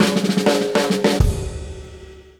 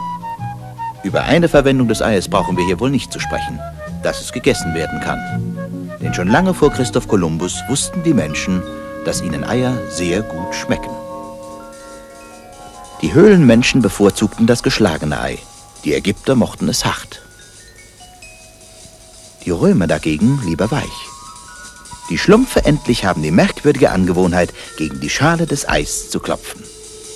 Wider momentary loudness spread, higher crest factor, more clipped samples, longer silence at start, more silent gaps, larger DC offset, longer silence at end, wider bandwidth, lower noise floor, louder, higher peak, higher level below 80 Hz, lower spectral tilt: about the same, 18 LU vs 20 LU; about the same, 16 dB vs 16 dB; neither; about the same, 0 s vs 0 s; neither; neither; first, 0.2 s vs 0 s; first, 18 kHz vs 14 kHz; about the same, -40 dBFS vs -41 dBFS; about the same, -18 LUFS vs -16 LUFS; about the same, -2 dBFS vs 0 dBFS; first, -28 dBFS vs -36 dBFS; about the same, -5 dB/octave vs -5.5 dB/octave